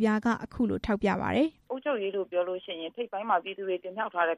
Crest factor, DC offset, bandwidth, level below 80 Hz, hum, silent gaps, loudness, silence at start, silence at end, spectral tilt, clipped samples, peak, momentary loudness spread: 16 dB; under 0.1%; 10.5 kHz; -54 dBFS; none; none; -30 LUFS; 0 s; 0 s; -6.5 dB/octave; under 0.1%; -14 dBFS; 8 LU